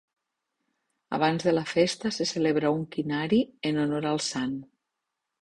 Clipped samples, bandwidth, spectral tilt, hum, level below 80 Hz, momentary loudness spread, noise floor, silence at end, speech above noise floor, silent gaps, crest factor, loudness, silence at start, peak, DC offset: under 0.1%; 11.5 kHz; -5 dB/octave; none; -64 dBFS; 6 LU; -84 dBFS; 0.8 s; 58 dB; none; 20 dB; -27 LUFS; 1.1 s; -10 dBFS; under 0.1%